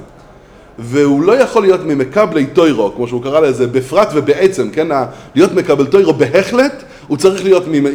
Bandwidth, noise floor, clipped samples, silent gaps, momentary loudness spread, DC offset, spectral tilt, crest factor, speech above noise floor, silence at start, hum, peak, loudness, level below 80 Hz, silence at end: 14 kHz; -39 dBFS; 0.3%; none; 6 LU; under 0.1%; -6 dB/octave; 12 dB; 28 dB; 0 s; none; 0 dBFS; -12 LUFS; -46 dBFS; 0 s